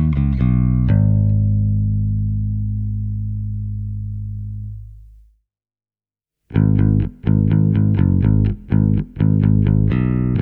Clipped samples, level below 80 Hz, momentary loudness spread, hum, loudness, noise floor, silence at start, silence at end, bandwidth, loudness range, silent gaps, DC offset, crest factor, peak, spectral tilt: under 0.1%; -28 dBFS; 12 LU; none; -18 LUFS; under -90 dBFS; 0 s; 0 s; 3.4 kHz; 11 LU; none; under 0.1%; 14 dB; -2 dBFS; -12.5 dB/octave